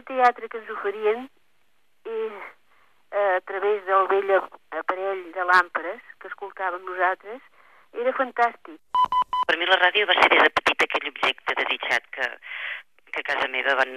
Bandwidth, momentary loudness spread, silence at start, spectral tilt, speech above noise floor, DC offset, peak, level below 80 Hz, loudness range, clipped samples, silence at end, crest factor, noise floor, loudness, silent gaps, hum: 14 kHz; 17 LU; 0.05 s; -2 dB/octave; 46 dB; 0.1%; -4 dBFS; -66 dBFS; 8 LU; under 0.1%; 0 s; 20 dB; -70 dBFS; -23 LUFS; none; none